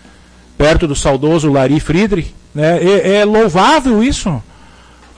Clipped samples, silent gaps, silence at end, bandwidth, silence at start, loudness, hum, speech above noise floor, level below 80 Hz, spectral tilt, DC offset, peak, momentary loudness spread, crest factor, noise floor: under 0.1%; none; 0.75 s; 10.5 kHz; 0.6 s; -12 LUFS; none; 30 dB; -28 dBFS; -5.5 dB/octave; under 0.1%; -2 dBFS; 9 LU; 10 dB; -41 dBFS